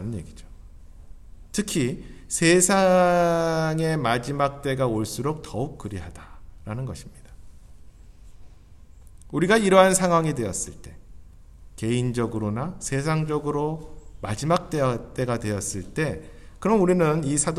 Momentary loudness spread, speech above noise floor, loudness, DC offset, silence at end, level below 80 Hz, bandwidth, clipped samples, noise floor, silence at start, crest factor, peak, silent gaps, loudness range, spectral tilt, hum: 18 LU; 24 dB; -23 LUFS; under 0.1%; 0 s; -46 dBFS; 14.5 kHz; under 0.1%; -47 dBFS; 0 s; 22 dB; -2 dBFS; none; 13 LU; -5 dB/octave; none